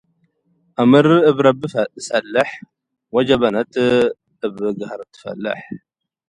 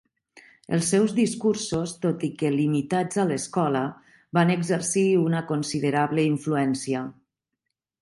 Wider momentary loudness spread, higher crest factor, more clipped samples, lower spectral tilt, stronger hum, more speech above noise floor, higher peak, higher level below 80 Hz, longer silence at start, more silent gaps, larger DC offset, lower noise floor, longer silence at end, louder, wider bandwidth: first, 18 LU vs 7 LU; about the same, 18 dB vs 18 dB; neither; about the same, -6 dB/octave vs -5.5 dB/octave; neither; second, 47 dB vs 59 dB; first, 0 dBFS vs -8 dBFS; first, -56 dBFS vs -64 dBFS; first, 0.8 s vs 0.35 s; neither; neither; second, -63 dBFS vs -83 dBFS; second, 0.5 s vs 0.9 s; first, -17 LUFS vs -24 LUFS; about the same, 11 kHz vs 11.5 kHz